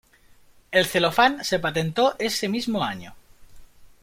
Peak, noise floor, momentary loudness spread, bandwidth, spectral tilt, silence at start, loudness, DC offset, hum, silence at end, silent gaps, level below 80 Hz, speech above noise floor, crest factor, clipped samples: -4 dBFS; -54 dBFS; 7 LU; 16.5 kHz; -4 dB/octave; 0.7 s; -22 LUFS; under 0.1%; none; 0.15 s; none; -56 dBFS; 31 dB; 22 dB; under 0.1%